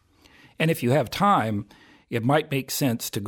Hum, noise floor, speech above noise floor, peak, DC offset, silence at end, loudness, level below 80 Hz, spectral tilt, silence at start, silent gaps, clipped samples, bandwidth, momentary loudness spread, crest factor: none; -55 dBFS; 31 dB; -6 dBFS; under 0.1%; 0 s; -24 LUFS; -58 dBFS; -5.5 dB/octave; 0.6 s; none; under 0.1%; 18 kHz; 8 LU; 18 dB